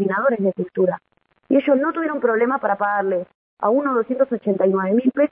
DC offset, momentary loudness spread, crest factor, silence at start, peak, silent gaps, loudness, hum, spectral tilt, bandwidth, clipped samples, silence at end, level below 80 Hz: under 0.1%; 5 LU; 14 dB; 0 s; -4 dBFS; 3.35-3.57 s; -20 LUFS; none; -11.5 dB/octave; 3.7 kHz; under 0.1%; 0.05 s; -70 dBFS